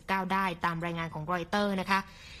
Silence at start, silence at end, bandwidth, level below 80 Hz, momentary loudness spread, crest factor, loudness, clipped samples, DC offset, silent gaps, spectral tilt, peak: 0.1 s; 0 s; 15 kHz; -56 dBFS; 6 LU; 20 dB; -31 LUFS; under 0.1%; under 0.1%; none; -5.5 dB/octave; -12 dBFS